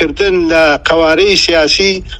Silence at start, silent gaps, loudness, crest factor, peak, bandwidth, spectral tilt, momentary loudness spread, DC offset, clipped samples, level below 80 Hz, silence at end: 0 s; none; -9 LUFS; 10 dB; 0 dBFS; 11.5 kHz; -3 dB/octave; 3 LU; under 0.1%; 0.3%; -30 dBFS; 0 s